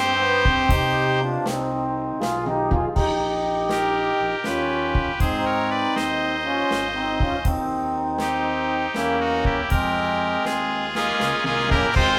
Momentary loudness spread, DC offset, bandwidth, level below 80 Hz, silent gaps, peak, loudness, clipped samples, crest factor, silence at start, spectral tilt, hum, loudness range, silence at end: 5 LU; under 0.1%; 17 kHz; -30 dBFS; none; -4 dBFS; -22 LUFS; under 0.1%; 18 dB; 0 s; -5.5 dB/octave; none; 1 LU; 0 s